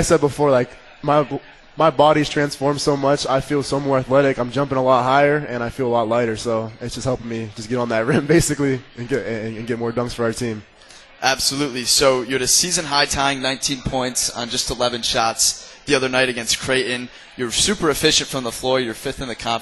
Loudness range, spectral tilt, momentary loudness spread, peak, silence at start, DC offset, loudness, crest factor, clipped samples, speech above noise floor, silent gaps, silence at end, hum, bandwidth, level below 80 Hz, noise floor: 3 LU; -3.5 dB/octave; 11 LU; -2 dBFS; 0 s; under 0.1%; -19 LUFS; 18 dB; under 0.1%; 25 dB; none; 0 s; none; 12.5 kHz; -42 dBFS; -45 dBFS